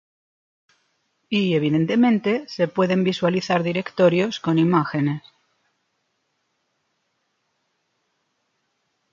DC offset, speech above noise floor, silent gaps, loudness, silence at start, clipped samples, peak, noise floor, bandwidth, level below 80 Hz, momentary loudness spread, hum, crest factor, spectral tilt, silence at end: under 0.1%; 53 dB; none; -21 LUFS; 1.3 s; under 0.1%; -6 dBFS; -73 dBFS; 7.4 kHz; -66 dBFS; 6 LU; none; 18 dB; -7 dB/octave; 3.95 s